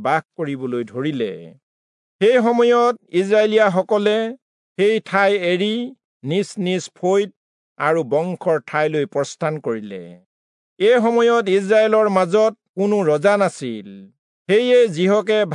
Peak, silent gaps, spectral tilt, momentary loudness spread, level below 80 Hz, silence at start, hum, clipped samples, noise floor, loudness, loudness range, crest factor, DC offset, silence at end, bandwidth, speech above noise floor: -4 dBFS; 1.63-2.19 s, 4.42-4.75 s, 6.04-6.20 s, 7.36-7.76 s, 10.26-10.76 s, 12.69-12.74 s, 14.19-14.45 s; -5.5 dB/octave; 12 LU; -76 dBFS; 0 s; none; under 0.1%; under -90 dBFS; -18 LUFS; 5 LU; 14 dB; under 0.1%; 0 s; 11 kHz; over 72 dB